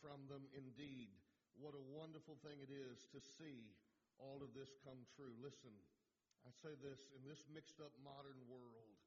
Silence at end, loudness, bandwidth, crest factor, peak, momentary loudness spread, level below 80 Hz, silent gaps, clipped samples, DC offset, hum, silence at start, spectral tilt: 0 s; -60 LUFS; 7.2 kHz; 16 dB; -42 dBFS; 6 LU; under -90 dBFS; none; under 0.1%; under 0.1%; none; 0 s; -5.5 dB/octave